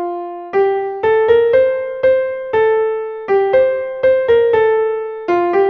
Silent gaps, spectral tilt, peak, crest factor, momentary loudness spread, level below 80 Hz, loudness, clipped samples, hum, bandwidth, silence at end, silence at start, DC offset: none; -7 dB/octave; -2 dBFS; 14 dB; 8 LU; -50 dBFS; -15 LUFS; under 0.1%; none; 5.2 kHz; 0 s; 0 s; under 0.1%